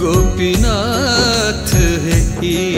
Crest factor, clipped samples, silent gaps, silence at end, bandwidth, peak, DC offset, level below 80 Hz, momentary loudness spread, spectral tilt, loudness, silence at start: 12 dB; under 0.1%; none; 0 s; 16.5 kHz; 0 dBFS; under 0.1%; -20 dBFS; 3 LU; -4.5 dB/octave; -14 LUFS; 0 s